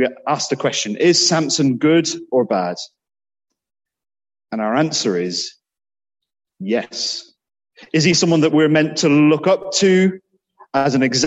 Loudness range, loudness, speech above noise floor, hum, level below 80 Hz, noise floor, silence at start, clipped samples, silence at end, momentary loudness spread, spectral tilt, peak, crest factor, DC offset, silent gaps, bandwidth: 8 LU; -17 LUFS; 34 dB; none; -62 dBFS; -51 dBFS; 0 s; under 0.1%; 0 s; 11 LU; -4 dB/octave; -2 dBFS; 16 dB; under 0.1%; none; 8.4 kHz